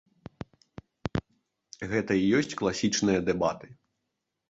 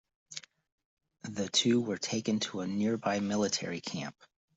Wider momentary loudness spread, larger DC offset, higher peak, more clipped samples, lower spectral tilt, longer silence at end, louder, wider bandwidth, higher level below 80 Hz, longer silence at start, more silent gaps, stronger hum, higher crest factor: first, 20 LU vs 17 LU; neither; about the same, -12 dBFS vs -14 dBFS; neither; about the same, -5 dB/octave vs -4 dB/octave; first, 0.75 s vs 0.45 s; first, -28 LUFS vs -32 LUFS; about the same, 8 kHz vs 8.2 kHz; first, -54 dBFS vs -74 dBFS; first, 1.05 s vs 0.3 s; second, none vs 0.72-0.78 s, 0.85-0.97 s; neither; about the same, 18 dB vs 20 dB